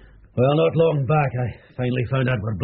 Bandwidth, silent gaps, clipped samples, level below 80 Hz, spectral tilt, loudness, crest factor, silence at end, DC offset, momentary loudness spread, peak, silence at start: 4.3 kHz; none; under 0.1%; -48 dBFS; -6.5 dB/octave; -21 LUFS; 12 dB; 0 s; under 0.1%; 10 LU; -8 dBFS; 0.35 s